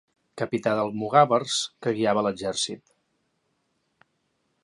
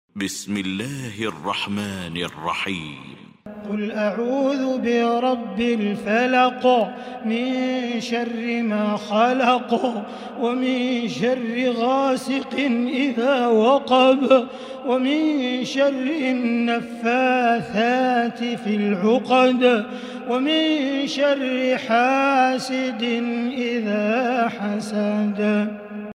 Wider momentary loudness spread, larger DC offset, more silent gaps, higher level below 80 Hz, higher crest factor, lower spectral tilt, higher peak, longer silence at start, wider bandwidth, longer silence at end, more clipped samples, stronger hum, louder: about the same, 10 LU vs 10 LU; neither; neither; about the same, -68 dBFS vs -64 dBFS; about the same, 22 dB vs 18 dB; about the same, -4 dB/octave vs -5 dB/octave; about the same, -4 dBFS vs -4 dBFS; first, 0.35 s vs 0.15 s; second, 11.5 kHz vs 14.5 kHz; first, 1.85 s vs 0.05 s; neither; neither; second, -24 LUFS vs -21 LUFS